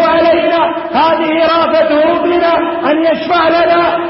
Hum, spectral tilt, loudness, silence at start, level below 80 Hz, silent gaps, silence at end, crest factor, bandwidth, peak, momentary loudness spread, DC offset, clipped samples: none; -8.5 dB/octave; -11 LUFS; 0 s; -46 dBFS; none; 0 s; 10 dB; 5.8 kHz; 0 dBFS; 3 LU; under 0.1%; under 0.1%